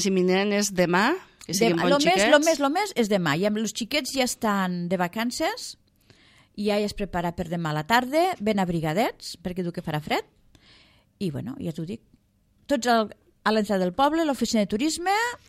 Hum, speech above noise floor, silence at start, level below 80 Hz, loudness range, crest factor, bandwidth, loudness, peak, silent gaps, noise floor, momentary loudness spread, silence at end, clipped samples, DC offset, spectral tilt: none; 40 dB; 0 s; -54 dBFS; 8 LU; 20 dB; 16 kHz; -24 LUFS; -6 dBFS; none; -64 dBFS; 12 LU; 0.1 s; under 0.1%; under 0.1%; -4.5 dB/octave